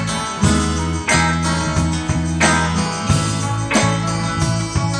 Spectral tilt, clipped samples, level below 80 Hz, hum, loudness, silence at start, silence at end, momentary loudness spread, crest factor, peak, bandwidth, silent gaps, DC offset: -4.5 dB/octave; under 0.1%; -30 dBFS; none; -17 LUFS; 0 s; 0 s; 5 LU; 16 dB; -2 dBFS; 10.5 kHz; none; under 0.1%